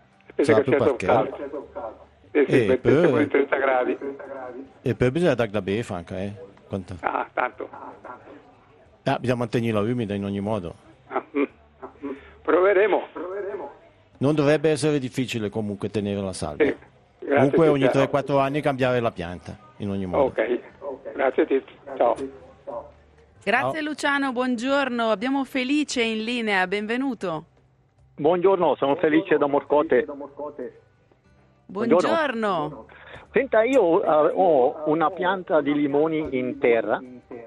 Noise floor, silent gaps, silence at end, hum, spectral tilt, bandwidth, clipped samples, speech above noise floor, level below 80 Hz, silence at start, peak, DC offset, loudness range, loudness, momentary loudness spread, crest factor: -59 dBFS; none; 0 s; none; -6 dB/octave; 12.5 kHz; under 0.1%; 37 dB; -58 dBFS; 0.4 s; -4 dBFS; under 0.1%; 6 LU; -23 LUFS; 17 LU; 20 dB